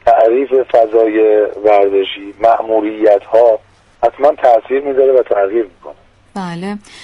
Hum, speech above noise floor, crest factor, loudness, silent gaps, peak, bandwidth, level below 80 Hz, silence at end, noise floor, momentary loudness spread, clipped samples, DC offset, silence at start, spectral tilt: none; 25 dB; 12 dB; -12 LUFS; none; 0 dBFS; 10.5 kHz; -52 dBFS; 0.25 s; -36 dBFS; 12 LU; under 0.1%; under 0.1%; 0.05 s; -6.5 dB/octave